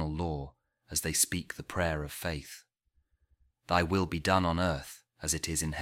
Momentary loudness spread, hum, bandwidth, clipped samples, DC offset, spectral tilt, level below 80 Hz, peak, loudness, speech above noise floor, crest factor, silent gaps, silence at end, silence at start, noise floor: 13 LU; none; 17 kHz; under 0.1%; under 0.1%; -3.5 dB/octave; -48 dBFS; -10 dBFS; -31 LUFS; 43 dB; 24 dB; none; 0 s; 0 s; -74 dBFS